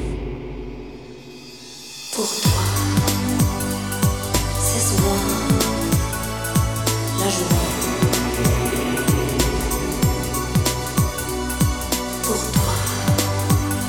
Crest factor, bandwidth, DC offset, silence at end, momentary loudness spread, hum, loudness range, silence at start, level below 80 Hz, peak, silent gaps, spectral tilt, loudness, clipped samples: 18 dB; 19.5 kHz; 0.3%; 0 s; 14 LU; none; 2 LU; 0 s; -30 dBFS; -2 dBFS; none; -4.5 dB/octave; -20 LUFS; under 0.1%